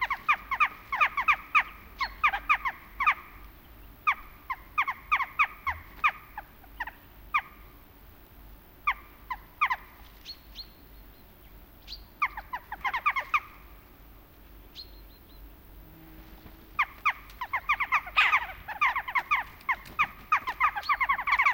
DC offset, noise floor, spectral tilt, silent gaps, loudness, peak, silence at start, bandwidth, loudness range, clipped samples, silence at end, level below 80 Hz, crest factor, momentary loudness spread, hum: under 0.1%; -52 dBFS; -2 dB/octave; none; -28 LUFS; -10 dBFS; 0 s; 17 kHz; 10 LU; under 0.1%; 0 s; -52 dBFS; 22 dB; 20 LU; none